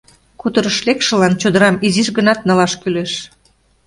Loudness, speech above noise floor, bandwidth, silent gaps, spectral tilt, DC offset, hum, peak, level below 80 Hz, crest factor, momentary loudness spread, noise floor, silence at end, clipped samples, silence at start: -15 LUFS; 41 dB; 11.5 kHz; none; -4.5 dB/octave; under 0.1%; none; 0 dBFS; -52 dBFS; 16 dB; 8 LU; -55 dBFS; 0.6 s; under 0.1%; 0.45 s